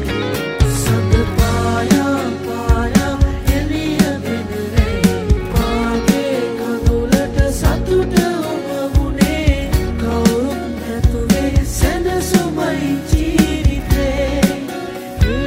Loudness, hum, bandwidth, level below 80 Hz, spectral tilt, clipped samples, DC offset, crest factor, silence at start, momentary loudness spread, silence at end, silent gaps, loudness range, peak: -17 LUFS; none; 16.5 kHz; -22 dBFS; -6 dB/octave; under 0.1%; under 0.1%; 16 dB; 0 s; 6 LU; 0 s; none; 1 LU; 0 dBFS